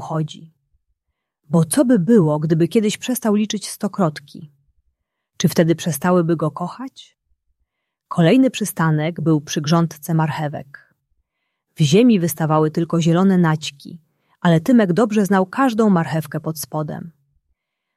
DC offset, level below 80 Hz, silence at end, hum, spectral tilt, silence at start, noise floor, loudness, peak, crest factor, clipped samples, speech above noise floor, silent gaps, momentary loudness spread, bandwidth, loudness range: under 0.1%; -62 dBFS; 0.85 s; none; -6 dB/octave; 0 s; -77 dBFS; -18 LUFS; -2 dBFS; 16 dB; under 0.1%; 60 dB; none; 12 LU; 15 kHz; 4 LU